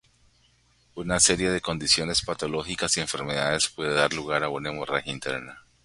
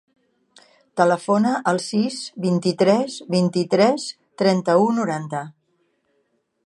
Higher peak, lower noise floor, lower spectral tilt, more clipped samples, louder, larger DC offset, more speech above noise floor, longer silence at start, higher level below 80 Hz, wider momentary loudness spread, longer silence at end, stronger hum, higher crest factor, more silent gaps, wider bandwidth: about the same, -4 dBFS vs -2 dBFS; second, -63 dBFS vs -69 dBFS; second, -2 dB/octave vs -6 dB/octave; neither; second, -25 LUFS vs -20 LUFS; neither; second, 37 dB vs 49 dB; about the same, 0.95 s vs 0.95 s; first, -50 dBFS vs -72 dBFS; about the same, 11 LU vs 10 LU; second, 0.25 s vs 1.15 s; neither; first, 24 dB vs 18 dB; neither; about the same, 11.5 kHz vs 11.5 kHz